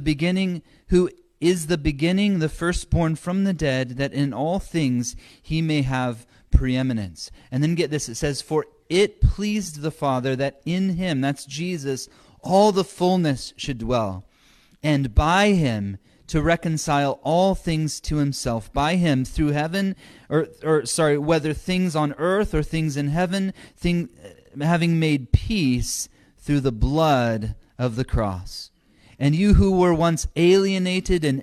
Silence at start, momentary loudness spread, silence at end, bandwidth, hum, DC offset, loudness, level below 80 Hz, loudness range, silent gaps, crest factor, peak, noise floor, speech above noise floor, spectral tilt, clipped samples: 0 s; 10 LU; 0 s; 13.5 kHz; none; under 0.1%; -22 LUFS; -34 dBFS; 3 LU; none; 20 dB; -2 dBFS; -56 dBFS; 34 dB; -6 dB/octave; under 0.1%